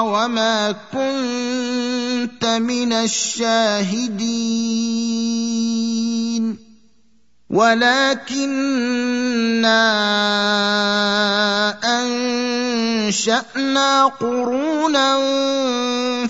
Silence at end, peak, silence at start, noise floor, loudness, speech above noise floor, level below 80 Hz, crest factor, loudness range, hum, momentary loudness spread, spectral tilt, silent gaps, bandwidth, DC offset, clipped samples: 0 s; -2 dBFS; 0 s; -62 dBFS; -18 LUFS; 43 dB; -66 dBFS; 18 dB; 3 LU; none; 7 LU; -3 dB/octave; none; 8 kHz; 0.2%; under 0.1%